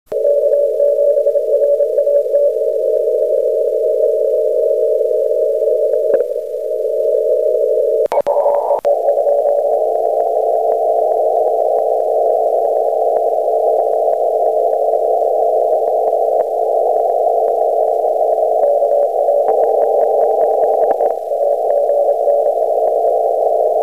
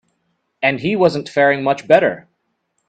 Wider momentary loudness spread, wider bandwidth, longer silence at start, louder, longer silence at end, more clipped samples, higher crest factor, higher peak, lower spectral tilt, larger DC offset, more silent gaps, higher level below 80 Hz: second, 2 LU vs 6 LU; first, 15 kHz vs 9 kHz; second, 0.1 s vs 0.6 s; about the same, -14 LUFS vs -16 LUFS; second, 0 s vs 0.7 s; neither; second, 12 dB vs 18 dB; about the same, -2 dBFS vs 0 dBFS; about the same, -5 dB/octave vs -6 dB/octave; first, 0.4% vs under 0.1%; neither; about the same, -62 dBFS vs -58 dBFS